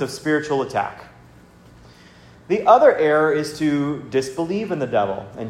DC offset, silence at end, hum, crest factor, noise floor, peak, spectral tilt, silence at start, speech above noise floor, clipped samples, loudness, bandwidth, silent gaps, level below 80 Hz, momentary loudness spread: under 0.1%; 0 s; none; 20 dB; -47 dBFS; 0 dBFS; -6 dB/octave; 0 s; 28 dB; under 0.1%; -19 LUFS; 13.5 kHz; none; -56 dBFS; 12 LU